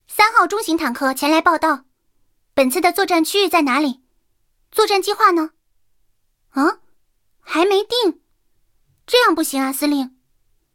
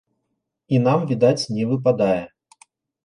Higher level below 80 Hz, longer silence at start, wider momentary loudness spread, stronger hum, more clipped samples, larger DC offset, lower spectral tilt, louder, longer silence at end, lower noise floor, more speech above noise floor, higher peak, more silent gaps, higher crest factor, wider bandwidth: about the same, -60 dBFS vs -60 dBFS; second, 0.1 s vs 0.7 s; first, 10 LU vs 5 LU; neither; neither; neither; second, -1.5 dB/octave vs -7 dB/octave; first, -17 LUFS vs -20 LUFS; second, 0.65 s vs 0.8 s; second, -66 dBFS vs -76 dBFS; second, 49 dB vs 58 dB; first, 0 dBFS vs -4 dBFS; neither; about the same, 18 dB vs 18 dB; first, 17 kHz vs 11.5 kHz